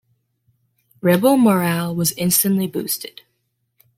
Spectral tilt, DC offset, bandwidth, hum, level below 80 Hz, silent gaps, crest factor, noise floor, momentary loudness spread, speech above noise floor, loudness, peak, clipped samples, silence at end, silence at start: -4.5 dB/octave; under 0.1%; 16.5 kHz; none; -60 dBFS; none; 18 dB; -71 dBFS; 10 LU; 53 dB; -18 LUFS; -2 dBFS; under 0.1%; 0.9 s; 1.05 s